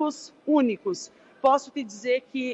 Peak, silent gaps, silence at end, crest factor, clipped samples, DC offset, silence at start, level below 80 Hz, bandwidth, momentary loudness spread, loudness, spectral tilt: -8 dBFS; none; 0 s; 18 dB; under 0.1%; under 0.1%; 0 s; -74 dBFS; 8.2 kHz; 13 LU; -26 LUFS; -4 dB/octave